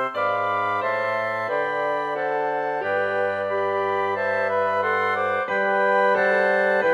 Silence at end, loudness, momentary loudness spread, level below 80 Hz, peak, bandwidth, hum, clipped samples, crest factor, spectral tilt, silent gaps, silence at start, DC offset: 0 s; -22 LUFS; 5 LU; -70 dBFS; -8 dBFS; 11 kHz; none; under 0.1%; 14 dB; -5.5 dB/octave; none; 0 s; under 0.1%